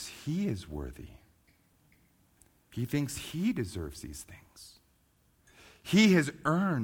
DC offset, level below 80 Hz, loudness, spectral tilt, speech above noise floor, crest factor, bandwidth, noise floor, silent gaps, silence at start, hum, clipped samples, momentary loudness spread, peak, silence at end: under 0.1%; -54 dBFS; -30 LUFS; -5.5 dB/octave; 38 dB; 20 dB; 18 kHz; -69 dBFS; none; 0 s; none; under 0.1%; 26 LU; -12 dBFS; 0 s